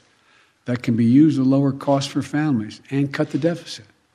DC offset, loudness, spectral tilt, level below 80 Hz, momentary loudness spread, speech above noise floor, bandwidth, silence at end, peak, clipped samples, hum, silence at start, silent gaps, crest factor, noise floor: under 0.1%; -20 LUFS; -7 dB/octave; -66 dBFS; 15 LU; 38 dB; 11 kHz; 0.35 s; -4 dBFS; under 0.1%; none; 0.65 s; none; 16 dB; -57 dBFS